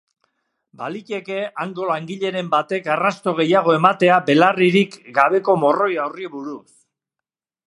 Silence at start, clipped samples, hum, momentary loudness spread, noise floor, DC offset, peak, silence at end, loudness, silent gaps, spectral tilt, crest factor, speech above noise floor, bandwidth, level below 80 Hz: 0.8 s; under 0.1%; none; 16 LU; -86 dBFS; under 0.1%; 0 dBFS; 1.1 s; -18 LUFS; none; -6 dB/octave; 20 dB; 68 dB; 11.5 kHz; -72 dBFS